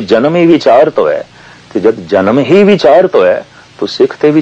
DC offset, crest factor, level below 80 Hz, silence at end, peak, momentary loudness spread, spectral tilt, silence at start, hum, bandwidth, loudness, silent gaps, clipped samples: under 0.1%; 8 dB; -50 dBFS; 0 s; 0 dBFS; 12 LU; -7 dB/octave; 0 s; none; 8.4 kHz; -8 LUFS; none; 1%